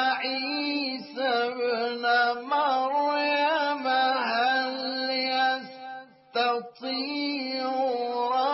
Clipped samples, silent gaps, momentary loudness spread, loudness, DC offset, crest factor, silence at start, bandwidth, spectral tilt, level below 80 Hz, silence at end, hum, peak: under 0.1%; none; 8 LU; -26 LUFS; under 0.1%; 14 dB; 0 s; 6 kHz; 1.5 dB/octave; -88 dBFS; 0 s; none; -12 dBFS